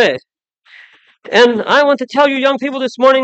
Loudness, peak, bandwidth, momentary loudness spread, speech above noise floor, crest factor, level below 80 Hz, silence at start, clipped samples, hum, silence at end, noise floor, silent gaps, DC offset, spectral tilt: -12 LUFS; 0 dBFS; 8.4 kHz; 7 LU; 34 dB; 14 dB; -70 dBFS; 0 s; under 0.1%; none; 0 s; -46 dBFS; none; under 0.1%; -4 dB/octave